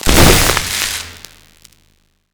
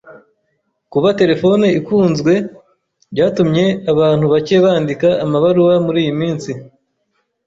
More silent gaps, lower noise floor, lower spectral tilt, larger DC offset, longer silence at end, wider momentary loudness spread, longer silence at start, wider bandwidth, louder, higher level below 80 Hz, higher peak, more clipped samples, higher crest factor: neither; second, -57 dBFS vs -67 dBFS; second, -3 dB/octave vs -7 dB/octave; neither; first, 1.2 s vs 0.8 s; first, 15 LU vs 9 LU; about the same, 0.05 s vs 0.05 s; first, over 20 kHz vs 7.8 kHz; about the same, -12 LUFS vs -14 LUFS; first, -22 dBFS vs -52 dBFS; about the same, 0 dBFS vs -2 dBFS; neither; about the same, 14 dB vs 12 dB